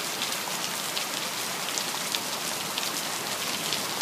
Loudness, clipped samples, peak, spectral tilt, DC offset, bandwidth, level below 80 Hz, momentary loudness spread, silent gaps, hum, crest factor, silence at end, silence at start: -28 LUFS; under 0.1%; -4 dBFS; -0.5 dB/octave; under 0.1%; 16 kHz; -76 dBFS; 1 LU; none; none; 26 dB; 0 s; 0 s